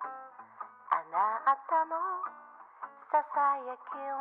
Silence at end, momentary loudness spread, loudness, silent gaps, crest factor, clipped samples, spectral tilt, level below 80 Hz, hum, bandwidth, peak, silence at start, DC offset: 0 s; 19 LU; -32 LUFS; none; 20 dB; under 0.1%; -0.5 dB/octave; under -90 dBFS; none; 4.2 kHz; -14 dBFS; 0 s; under 0.1%